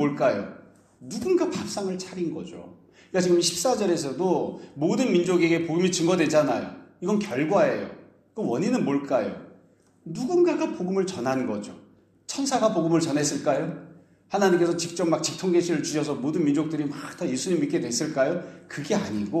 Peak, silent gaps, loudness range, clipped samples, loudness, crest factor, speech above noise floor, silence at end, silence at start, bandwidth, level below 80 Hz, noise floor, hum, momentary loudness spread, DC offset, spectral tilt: -8 dBFS; none; 4 LU; under 0.1%; -25 LUFS; 18 dB; 33 dB; 0 s; 0 s; 14 kHz; -68 dBFS; -58 dBFS; none; 12 LU; under 0.1%; -5 dB/octave